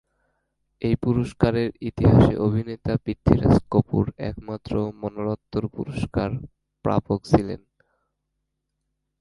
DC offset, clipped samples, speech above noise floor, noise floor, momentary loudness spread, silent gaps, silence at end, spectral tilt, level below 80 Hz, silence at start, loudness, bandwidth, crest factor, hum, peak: under 0.1%; under 0.1%; 56 dB; -78 dBFS; 12 LU; none; 1.65 s; -9 dB/octave; -38 dBFS; 0.8 s; -23 LUFS; 11.5 kHz; 22 dB; none; 0 dBFS